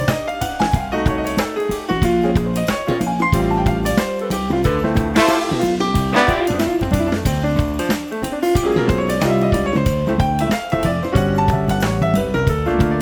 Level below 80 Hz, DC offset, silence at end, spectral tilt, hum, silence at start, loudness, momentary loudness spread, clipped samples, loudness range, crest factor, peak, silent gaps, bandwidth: -28 dBFS; under 0.1%; 0 s; -6 dB/octave; none; 0 s; -18 LUFS; 4 LU; under 0.1%; 1 LU; 16 dB; -2 dBFS; none; over 20 kHz